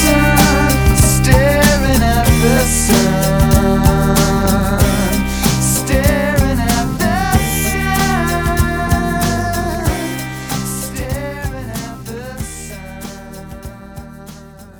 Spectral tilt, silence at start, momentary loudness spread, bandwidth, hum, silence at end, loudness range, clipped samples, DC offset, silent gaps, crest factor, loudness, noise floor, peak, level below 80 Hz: -4.5 dB/octave; 0 s; 18 LU; over 20 kHz; none; 0.1 s; 13 LU; under 0.1%; under 0.1%; none; 14 dB; -14 LUFS; -35 dBFS; 0 dBFS; -22 dBFS